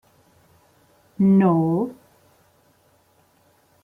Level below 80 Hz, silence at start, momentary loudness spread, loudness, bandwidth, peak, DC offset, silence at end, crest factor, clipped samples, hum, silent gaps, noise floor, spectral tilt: -64 dBFS; 1.2 s; 10 LU; -19 LUFS; 3.1 kHz; -8 dBFS; under 0.1%; 1.9 s; 16 dB; under 0.1%; none; none; -60 dBFS; -11 dB/octave